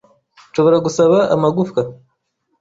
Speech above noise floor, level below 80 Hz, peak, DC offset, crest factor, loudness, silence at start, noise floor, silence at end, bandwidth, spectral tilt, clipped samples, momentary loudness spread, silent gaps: 54 dB; -56 dBFS; -2 dBFS; under 0.1%; 14 dB; -15 LUFS; 0.55 s; -68 dBFS; 0.65 s; 7.8 kHz; -6.5 dB/octave; under 0.1%; 10 LU; none